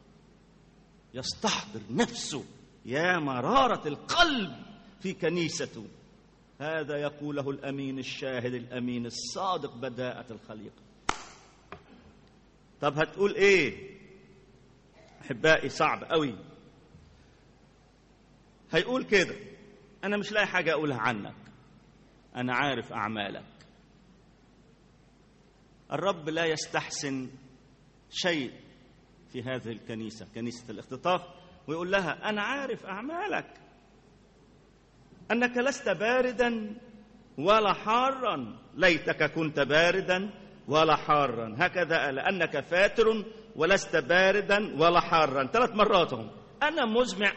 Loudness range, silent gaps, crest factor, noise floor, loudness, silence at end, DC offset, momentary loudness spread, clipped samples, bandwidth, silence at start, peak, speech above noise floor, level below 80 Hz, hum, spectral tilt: 10 LU; none; 22 dB; -60 dBFS; -28 LUFS; 0 s; under 0.1%; 16 LU; under 0.1%; 8.4 kHz; 1.15 s; -8 dBFS; 32 dB; -58 dBFS; none; -4 dB/octave